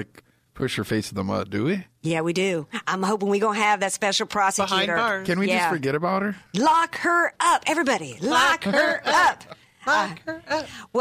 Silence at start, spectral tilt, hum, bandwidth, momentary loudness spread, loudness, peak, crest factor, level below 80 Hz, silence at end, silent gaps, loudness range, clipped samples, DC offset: 0 s; -3.5 dB/octave; none; 15.5 kHz; 9 LU; -22 LUFS; -10 dBFS; 14 dB; -60 dBFS; 0 s; none; 3 LU; under 0.1%; under 0.1%